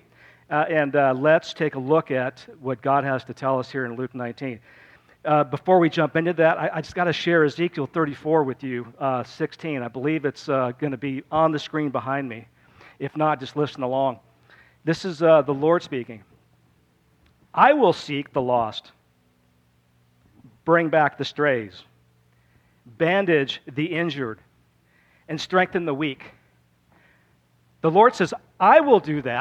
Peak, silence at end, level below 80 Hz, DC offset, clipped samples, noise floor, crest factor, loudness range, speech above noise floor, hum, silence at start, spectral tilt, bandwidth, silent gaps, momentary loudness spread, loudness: -2 dBFS; 0 s; -64 dBFS; under 0.1%; under 0.1%; -62 dBFS; 20 dB; 5 LU; 41 dB; none; 0.5 s; -6.5 dB/octave; 9 kHz; none; 14 LU; -22 LUFS